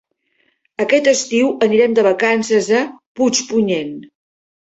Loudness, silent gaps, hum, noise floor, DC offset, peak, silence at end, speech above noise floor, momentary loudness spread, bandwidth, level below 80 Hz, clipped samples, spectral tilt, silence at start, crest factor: -15 LUFS; 3.06-3.15 s; none; -63 dBFS; under 0.1%; -2 dBFS; 0.6 s; 48 dB; 11 LU; 8.2 kHz; -60 dBFS; under 0.1%; -3.5 dB/octave; 0.8 s; 14 dB